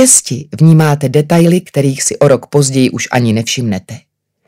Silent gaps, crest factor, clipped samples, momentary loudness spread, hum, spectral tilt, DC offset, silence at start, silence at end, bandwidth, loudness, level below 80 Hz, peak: none; 10 dB; 0.7%; 8 LU; none; -5 dB/octave; under 0.1%; 0 s; 0.5 s; 16 kHz; -11 LUFS; -52 dBFS; 0 dBFS